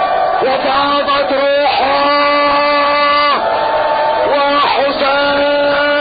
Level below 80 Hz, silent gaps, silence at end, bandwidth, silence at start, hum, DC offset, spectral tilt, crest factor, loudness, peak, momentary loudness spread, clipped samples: -44 dBFS; none; 0 s; 5 kHz; 0 s; none; under 0.1%; -6.5 dB/octave; 10 dB; -12 LUFS; -2 dBFS; 3 LU; under 0.1%